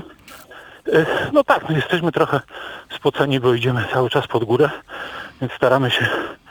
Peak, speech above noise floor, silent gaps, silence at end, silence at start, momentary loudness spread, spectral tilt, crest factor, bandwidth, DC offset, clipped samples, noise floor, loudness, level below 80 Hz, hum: 0 dBFS; 23 dB; none; 0.15 s; 0 s; 15 LU; -6.5 dB/octave; 18 dB; over 20 kHz; under 0.1%; under 0.1%; -42 dBFS; -19 LUFS; -54 dBFS; none